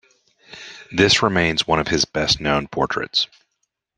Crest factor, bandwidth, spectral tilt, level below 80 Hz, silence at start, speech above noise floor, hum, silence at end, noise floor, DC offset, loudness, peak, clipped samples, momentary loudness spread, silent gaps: 20 dB; 12 kHz; -3.5 dB/octave; -46 dBFS; 0.5 s; 55 dB; none; 0.75 s; -74 dBFS; under 0.1%; -19 LUFS; -2 dBFS; under 0.1%; 13 LU; none